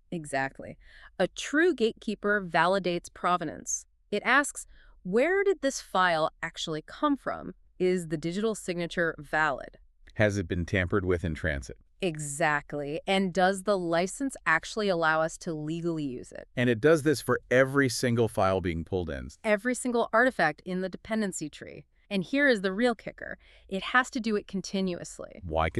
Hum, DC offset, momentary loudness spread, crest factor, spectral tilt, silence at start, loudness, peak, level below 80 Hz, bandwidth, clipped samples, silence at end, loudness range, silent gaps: none; under 0.1%; 13 LU; 20 dB; -4.5 dB/octave; 0.1 s; -28 LUFS; -8 dBFS; -52 dBFS; 13.5 kHz; under 0.1%; 0 s; 4 LU; none